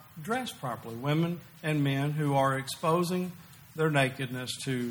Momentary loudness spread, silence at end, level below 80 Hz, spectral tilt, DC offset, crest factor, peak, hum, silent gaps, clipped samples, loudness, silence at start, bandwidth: 10 LU; 0 s; -68 dBFS; -5.5 dB/octave; under 0.1%; 18 dB; -12 dBFS; none; none; under 0.1%; -30 LUFS; 0 s; over 20 kHz